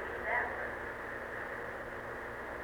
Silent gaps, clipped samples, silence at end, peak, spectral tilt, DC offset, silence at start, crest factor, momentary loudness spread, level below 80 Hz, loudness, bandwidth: none; under 0.1%; 0 s; -20 dBFS; -5.5 dB/octave; under 0.1%; 0 s; 20 dB; 8 LU; -58 dBFS; -39 LUFS; over 20 kHz